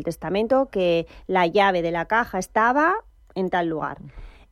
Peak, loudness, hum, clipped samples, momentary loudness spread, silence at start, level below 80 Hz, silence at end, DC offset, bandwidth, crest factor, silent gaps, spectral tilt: -6 dBFS; -22 LUFS; none; under 0.1%; 11 LU; 0 s; -48 dBFS; 0.2 s; under 0.1%; 15 kHz; 18 dB; none; -5.5 dB/octave